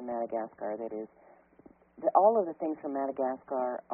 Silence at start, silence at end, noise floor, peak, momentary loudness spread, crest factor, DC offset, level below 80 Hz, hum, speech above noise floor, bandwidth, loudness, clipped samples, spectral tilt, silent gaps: 0 s; 0 s; -59 dBFS; -10 dBFS; 14 LU; 22 dB; under 0.1%; -78 dBFS; none; 28 dB; 2.9 kHz; -31 LUFS; under 0.1%; -1.5 dB/octave; none